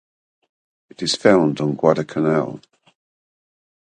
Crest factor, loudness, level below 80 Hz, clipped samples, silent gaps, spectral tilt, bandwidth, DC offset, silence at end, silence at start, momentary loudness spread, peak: 22 dB; -19 LUFS; -60 dBFS; under 0.1%; none; -5.5 dB/octave; 9.8 kHz; under 0.1%; 1.35 s; 1 s; 12 LU; 0 dBFS